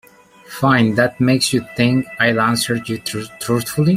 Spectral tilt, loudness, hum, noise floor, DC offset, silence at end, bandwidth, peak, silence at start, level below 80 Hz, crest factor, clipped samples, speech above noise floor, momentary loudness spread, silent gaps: -5 dB/octave; -17 LUFS; none; -43 dBFS; under 0.1%; 0 s; 16 kHz; -2 dBFS; 0.5 s; -52 dBFS; 16 dB; under 0.1%; 27 dB; 9 LU; none